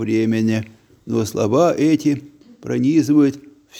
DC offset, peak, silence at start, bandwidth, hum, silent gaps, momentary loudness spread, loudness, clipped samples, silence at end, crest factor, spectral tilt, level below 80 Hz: under 0.1%; -2 dBFS; 0 s; 15.5 kHz; none; none; 11 LU; -18 LUFS; under 0.1%; 0 s; 16 dB; -7 dB/octave; -60 dBFS